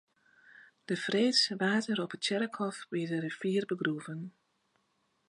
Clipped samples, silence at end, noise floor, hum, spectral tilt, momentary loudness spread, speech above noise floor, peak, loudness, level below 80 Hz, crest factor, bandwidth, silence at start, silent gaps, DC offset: under 0.1%; 1 s; -76 dBFS; none; -4.5 dB/octave; 14 LU; 44 dB; -14 dBFS; -32 LUFS; -84 dBFS; 20 dB; 11.5 kHz; 0.55 s; none; under 0.1%